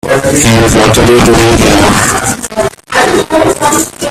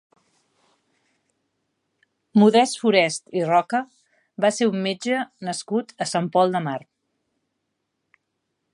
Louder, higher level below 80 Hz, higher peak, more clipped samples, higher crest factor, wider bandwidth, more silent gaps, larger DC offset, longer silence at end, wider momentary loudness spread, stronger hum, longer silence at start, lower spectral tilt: first, -7 LUFS vs -21 LUFS; first, -24 dBFS vs -78 dBFS; first, 0 dBFS vs -4 dBFS; first, 0.3% vs under 0.1%; second, 8 dB vs 20 dB; first, 16.5 kHz vs 11.5 kHz; neither; neither; second, 0 s vs 1.95 s; second, 7 LU vs 13 LU; neither; second, 0.05 s vs 2.35 s; about the same, -4 dB/octave vs -5 dB/octave